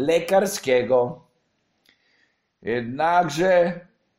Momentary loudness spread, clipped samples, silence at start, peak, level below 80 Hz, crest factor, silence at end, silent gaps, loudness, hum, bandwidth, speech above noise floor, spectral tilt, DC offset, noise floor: 13 LU; under 0.1%; 0 s; -6 dBFS; -60 dBFS; 16 dB; 0.35 s; none; -21 LUFS; none; 16 kHz; 49 dB; -4.5 dB/octave; under 0.1%; -70 dBFS